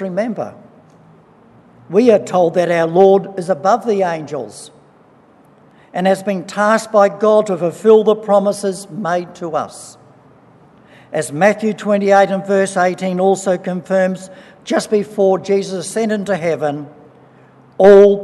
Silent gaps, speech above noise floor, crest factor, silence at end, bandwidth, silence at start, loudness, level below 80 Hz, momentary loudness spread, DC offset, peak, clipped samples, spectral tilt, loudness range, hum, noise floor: none; 34 dB; 16 dB; 0 s; 12 kHz; 0 s; -15 LUFS; -60 dBFS; 12 LU; under 0.1%; 0 dBFS; under 0.1%; -5.5 dB/octave; 5 LU; none; -48 dBFS